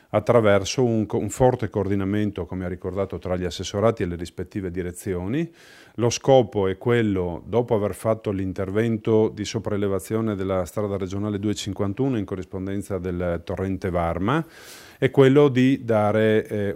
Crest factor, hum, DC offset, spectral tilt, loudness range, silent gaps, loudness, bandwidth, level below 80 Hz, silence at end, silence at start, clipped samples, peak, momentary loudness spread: 20 dB; none; under 0.1%; -6.5 dB/octave; 5 LU; none; -23 LUFS; 16 kHz; -52 dBFS; 0 s; 0.15 s; under 0.1%; -4 dBFS; 12 LU